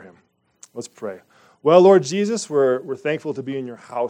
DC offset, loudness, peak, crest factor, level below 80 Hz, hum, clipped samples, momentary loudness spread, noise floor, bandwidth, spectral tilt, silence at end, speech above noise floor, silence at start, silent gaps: under 0.1%; -18 LUFS; 0 dBFS; 20 dB; -74 dBFS; none; under 0.1%; 21 LU; -59 dBFS; 10 kHz; -5.5 dB/octave; 0 s; 41 dB; 0.05 s; none